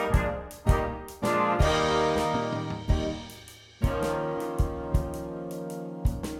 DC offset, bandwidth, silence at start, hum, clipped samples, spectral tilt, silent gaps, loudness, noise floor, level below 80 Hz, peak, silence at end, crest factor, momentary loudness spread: under 0.1%; 16.5 kHz; 0 s; none; under 0.1%; -6 dB/octave; none; -29 LUFS; -48 dBFS; -34 dBFS; -8 dBFS; 0 s; 20 dB; 12 LU